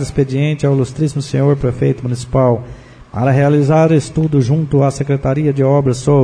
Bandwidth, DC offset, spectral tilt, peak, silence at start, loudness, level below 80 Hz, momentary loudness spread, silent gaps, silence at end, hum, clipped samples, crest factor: 10 kHz; under 0.1%; -8 dB/octave; 0 dBFS; 0 s; -14 LUFS; -38 dBFS; 6 LU; none; 0 s; none; under 0.1%; 12 dB